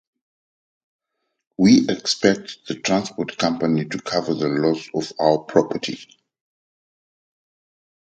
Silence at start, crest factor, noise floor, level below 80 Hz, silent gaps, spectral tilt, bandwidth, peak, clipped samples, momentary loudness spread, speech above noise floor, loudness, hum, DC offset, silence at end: 1.6 s; 22 dB; under -90 dBFS; -60 dBFS; none; -5 dB/octave; 9 kHz; 0 dBFS; under 0.1%; 12 LU; over 70 dB; -20 LUFS; none; under 0.1%; 2.1 s